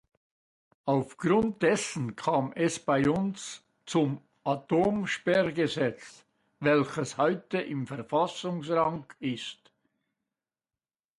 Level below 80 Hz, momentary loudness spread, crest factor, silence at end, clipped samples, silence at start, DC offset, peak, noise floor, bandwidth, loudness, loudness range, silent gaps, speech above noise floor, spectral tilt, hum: -64 dBFS; 10 LU; 18 dB; 1.65 s; under 0.1%; 0.85 s; under 0.1%; -12 dBFS; under -90 dBFS; 11.5 kHz; -29 LUFS; 4 LU; none; over 62 dB; -5.5 dB/octave; none